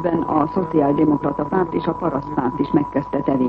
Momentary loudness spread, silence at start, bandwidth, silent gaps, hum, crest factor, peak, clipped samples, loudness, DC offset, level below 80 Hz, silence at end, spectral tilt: 5 LU; 0 s; 5.2 kHz; none; none; 16 dB; -4 dBFS; under 0.1%; -20 LUFS; under 0.1%; -46 dBFS; 0 s; -10 dB/octave